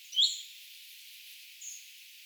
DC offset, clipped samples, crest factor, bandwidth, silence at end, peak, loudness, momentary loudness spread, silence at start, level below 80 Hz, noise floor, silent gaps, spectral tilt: under 0.1%; under 0.1%; 24 dB; over 20 kHz; 0 s; -14 dBFS; -31 LUFS; 21 LU; 0 s; under -90 dBFS; -52 dBFS; none; 11.5 dB/octave